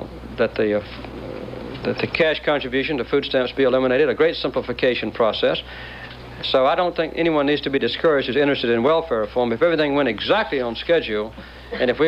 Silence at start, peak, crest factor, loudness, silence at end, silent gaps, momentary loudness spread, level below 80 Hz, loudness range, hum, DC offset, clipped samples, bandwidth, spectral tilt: 0 s; -6 dBFS; 14 dB; -20 LUFS; 0 s; none; 14 LU; -44 dBFS; 2 LU; none; under 0.1%; under 0.1%; 7.4 kHz; -6.5 dB/octave